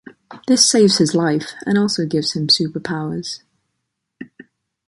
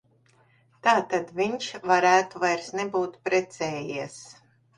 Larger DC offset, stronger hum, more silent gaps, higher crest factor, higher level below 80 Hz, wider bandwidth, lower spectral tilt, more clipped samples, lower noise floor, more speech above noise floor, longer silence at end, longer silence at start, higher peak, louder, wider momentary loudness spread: neither; neither; neither; about the same, 20 dB vs 22 dB; first, -60 dBFS vs -68 dBFS; about the same, 11.5 kHz vs 11 kHz; about the same, -3.5 dB/octave vs -4 dB/octave; neither; first, -76 dBFS vs -62 dBFS; first, 59 dB vs 37 dB; first, 0.65 s vs 0.45 s; second, 0.05 s vs 0.85 s; first, 0 dBFS vs -4 dBFS; first, -16 LUFS vs -25 LUFS; about the same, 14 LU vs 12 LU